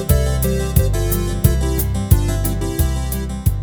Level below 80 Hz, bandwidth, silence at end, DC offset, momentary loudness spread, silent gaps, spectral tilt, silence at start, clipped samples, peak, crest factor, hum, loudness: -20 dBFS; over 20 kHz; 0 s; under 0.1%; 4 LU; none; -6 dB/octave; 0 s; under 0.1%; 0 dBFS; 16 dB; none; -18 LUFS